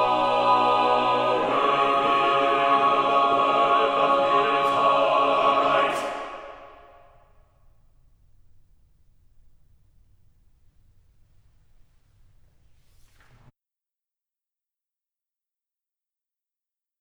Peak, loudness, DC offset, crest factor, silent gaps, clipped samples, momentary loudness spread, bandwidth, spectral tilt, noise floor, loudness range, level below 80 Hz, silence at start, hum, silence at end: -8 dBFS; -21 LUFS; under 0.1%; 18 dB; none; under 0.1%; 4 LU; 11.5 kHz; -4.5 dB/octave; under -90 dBFS; 8 LU; -60 dBFS; 0 s; none; 10.35 s